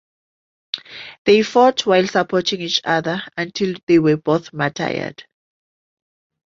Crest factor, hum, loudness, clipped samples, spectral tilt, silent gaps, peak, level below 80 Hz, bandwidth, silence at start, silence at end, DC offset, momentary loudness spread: 18 dB; none; -18 LUFS; under 0.1%; -5 dB/octave; 1.18-1.25 s, 3.83-3.87 s; -2 dBFS; -60 dBFS; 7.6 kHz; 0.75 s; 1.25 s; under 0.1%; 14 LU